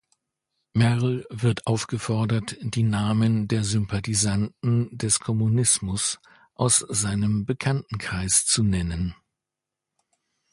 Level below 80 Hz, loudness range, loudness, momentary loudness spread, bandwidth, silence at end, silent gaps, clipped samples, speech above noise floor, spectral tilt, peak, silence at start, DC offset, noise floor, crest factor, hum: -46 dBFS; 2 LU; -24 LUFS; 8 LU; 11.5 kHz; 1.4 s; none; under 0.1%; 63 dB; -4.5 dB/octave; -6 dBFS; 0.75 s; under 0.1%; -86 dBFS; 18 dB; none